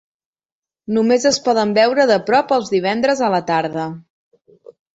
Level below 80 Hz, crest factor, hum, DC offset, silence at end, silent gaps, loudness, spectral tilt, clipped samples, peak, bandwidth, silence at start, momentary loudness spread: -62 dBFS; 16 dB; none; under 0.1%; 0.95 s; none; -16 LUFS; -4 dB/octave; under 0.1%; -2 dBFS; 8.2 kHz; 0.9 s; 11 LU